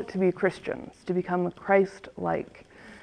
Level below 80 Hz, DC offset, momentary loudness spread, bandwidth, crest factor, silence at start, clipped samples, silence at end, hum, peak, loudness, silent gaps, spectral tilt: -62 dBFS; under 0.1%; 13 LU; 9.6 kHz; 20 dB; 0 s; under 0.1%; 0 s; none; -8 dBFS; -28 LUFS; none; -7.5 dB/octave